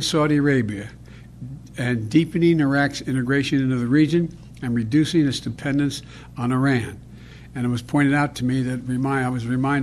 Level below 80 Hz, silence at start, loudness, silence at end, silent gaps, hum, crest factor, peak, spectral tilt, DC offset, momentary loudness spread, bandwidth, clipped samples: -48 dBFS; 0 s; -21 LUFS; 0 s; none; none; 16 dB; -4 dBFS; -6 dB/octave; under 0.1%; 15 LU; 13 kHz; under 0.1%